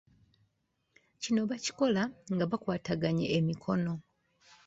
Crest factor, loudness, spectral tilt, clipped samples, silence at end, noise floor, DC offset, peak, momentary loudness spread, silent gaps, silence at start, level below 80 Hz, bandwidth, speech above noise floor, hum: 18 dB; -32 LUFS; -6 dB/octave; under 0.1%; 0.65 s; -78 dBFS; under 0.1%; -16 dBFS; 5 LU; none; 1.2 s; -66 dBFS; 8 kHz; 47 dB; none